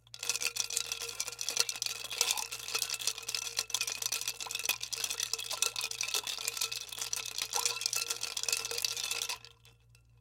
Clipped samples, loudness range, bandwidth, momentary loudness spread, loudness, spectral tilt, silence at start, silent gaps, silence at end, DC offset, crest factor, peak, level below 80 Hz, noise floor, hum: under 0.1%; 1 LU; 17 kHz; 5 LU; -33 LUFS; 2 dB/octave; 0.15 s; none; 0.25 s; under 0.1%; 28 dB; -8 dBFS; -70 dBFS; -62 dBFS; none